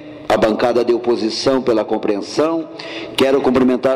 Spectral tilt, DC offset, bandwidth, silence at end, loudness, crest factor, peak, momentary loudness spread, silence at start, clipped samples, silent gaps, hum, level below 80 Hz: -5 dB/octave; under 0.1%; 15 kHz; 0 s; -16 LUFS; 10 dB; -6 dBFS; 7 LU; 0 s; under 0.1%; none; none; -50 dBFS